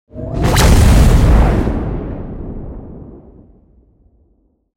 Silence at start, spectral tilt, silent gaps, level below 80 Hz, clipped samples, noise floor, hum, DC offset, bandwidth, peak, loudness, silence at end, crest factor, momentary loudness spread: 0.15 s; -6 dB/octave; none; -16 dBFS; under 0.1%; -57 dBFS; none; under 0.1%; 17 kHz; 0 dBFS; -13 LUFS; 1.6 s; 14 dB; 22 LU